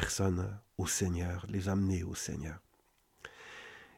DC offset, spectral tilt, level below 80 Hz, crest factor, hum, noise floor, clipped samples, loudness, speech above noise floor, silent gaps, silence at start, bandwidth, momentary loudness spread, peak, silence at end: under 0.1%; -4.5 dB/octave; -52 dBFS; 22 dB; none; -71 dBFS; under 0.1%; -35 LUFS; 37 dB; none; 0 s; 16 kHz; 18 LU; -14 dBFS; 0.1 s